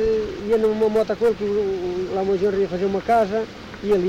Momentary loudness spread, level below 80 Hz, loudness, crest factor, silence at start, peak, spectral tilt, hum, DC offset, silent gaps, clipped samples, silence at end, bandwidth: 6 LU; -46 dBFS; -21 LUFS; 12 dB; 0 s; -8 dBFS; -7 dB/octave; none; under 0.1%; none; under 0.1%; 0 s; 10 kHz